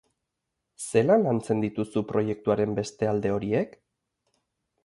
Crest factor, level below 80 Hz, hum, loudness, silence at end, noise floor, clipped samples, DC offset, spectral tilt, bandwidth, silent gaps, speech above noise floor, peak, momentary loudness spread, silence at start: 20 dB; -60 dBFS; none; -26 LUFS; 1.15 s; -83 dBFS; under 0.1%; under 0.1%; -6.5 dB/octave; 11.5 kHz; none; 58 dB; -8 dBFS; 7 LU; 0.8 s